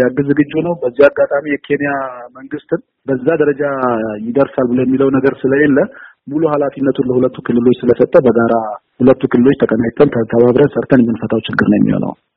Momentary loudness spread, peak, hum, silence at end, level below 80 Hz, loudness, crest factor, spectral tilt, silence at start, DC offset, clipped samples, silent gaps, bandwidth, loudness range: 10 LU; 0 dBFS; none; 0.25 s; -48 dBFS; -13 LUFS; 12 dB; -6.5 dB/octave; 0 s; under 0.1%; under 0.1%; none; 4.9 kHz; 4 LU